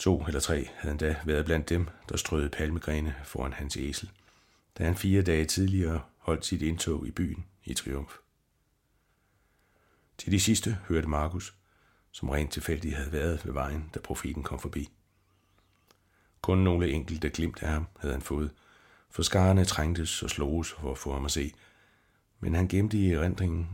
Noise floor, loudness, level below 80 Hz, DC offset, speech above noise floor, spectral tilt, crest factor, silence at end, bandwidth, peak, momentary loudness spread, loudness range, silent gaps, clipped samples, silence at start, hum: -72 dBFS; -30 LUFS; -40 dBFS; under 0.1%; 43 dB; -5 dB/octave; 20 dB; 0 s; 17 kHz; -12 dBFS; 12 LU; 6 LU; none; under 0.1%; 0 s; none